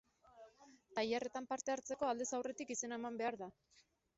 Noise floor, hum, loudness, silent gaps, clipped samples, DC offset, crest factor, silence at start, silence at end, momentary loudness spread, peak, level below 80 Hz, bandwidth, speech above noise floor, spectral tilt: -65 dBFS; none; -42 LUFS; none; under 0.1%; under 0.1%; 16 dB; 0.25 s; 0.65 s; 21 LU; -26 dBFS; -82 dBFS; 8 kHz; 23 dB; -2.5 dB/octave